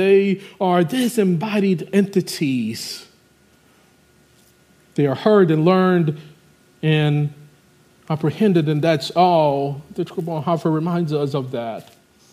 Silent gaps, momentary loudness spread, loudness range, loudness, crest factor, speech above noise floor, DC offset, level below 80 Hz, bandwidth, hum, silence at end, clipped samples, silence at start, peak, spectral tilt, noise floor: none; 12 LU; 4 LU; -19 LUFS; 18 dB; 37 dB; under 0.1%; -66 dBFS; 15.5 kHz; none; 0.5 s; under 0.1%; 0 s; -2 dBFS; -7 dB/octave; -55 dBFS